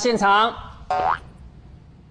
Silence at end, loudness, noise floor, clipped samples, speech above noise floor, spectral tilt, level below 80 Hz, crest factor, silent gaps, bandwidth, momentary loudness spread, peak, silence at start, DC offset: 0.35 s; -21 LUFS; -45 dBFS; under 0.1%; 26 dB; -3.5 dB/octave; -46 dBFS; 16 dB; none; 10.5 kHz; 11 LU; -6 dBFS; 0 s; under 0.1%